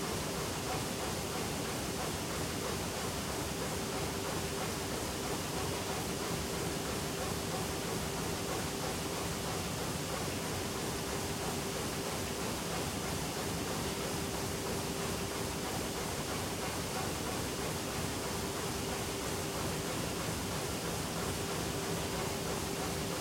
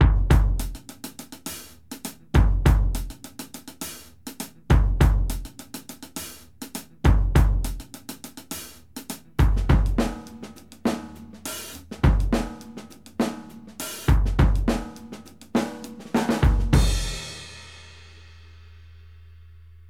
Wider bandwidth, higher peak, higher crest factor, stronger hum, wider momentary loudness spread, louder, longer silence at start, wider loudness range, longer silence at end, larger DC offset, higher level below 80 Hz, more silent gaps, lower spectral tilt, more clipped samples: about the same, 16.5 kHz vs 16.5 kHz; second, -22 dBFS vs -4 dBFS; second, 14 dB vs 20 dB; neither; second, 1 LU vs 19 LU; second, -36 LUFS vs -25 LUFS; about the same, 0 s vs 0 s; second, 0 LU vs 3 LU; second, 0 s vs 2.05 s; second, under 0.1% vs 0.2%; second, -52 dBFS vs -26 dBFS; neither; second, -3.5 dB/octave vs -6 dB/octave; neither